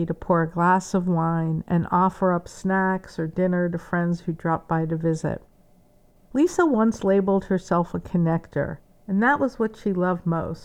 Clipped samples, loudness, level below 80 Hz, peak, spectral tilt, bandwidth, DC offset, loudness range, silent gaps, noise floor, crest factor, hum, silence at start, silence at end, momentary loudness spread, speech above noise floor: under 0.1%; -23 LUFS; -50 dBFS; -8 dBFS; -7.5 dB/octave; 9.6 kHz; under 0.1%; 3 LU; none; -56 dBFS; 16 dB; none; 0 s; 0 s; 8 LU; 33 dB